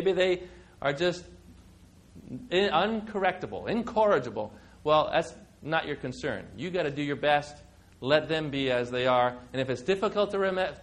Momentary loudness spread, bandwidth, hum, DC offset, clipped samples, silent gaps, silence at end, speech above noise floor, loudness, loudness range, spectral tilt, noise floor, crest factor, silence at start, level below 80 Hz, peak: 12 LU; 10.5 kHz; none; under 0.1%; under 0.1%; none; 0 s; 27 dB; -28 LUFS; 2 LU; -5.5 dB/octave; -55 dBFS; 20 dB; 0 s; -58 dBFS; -8 dBFS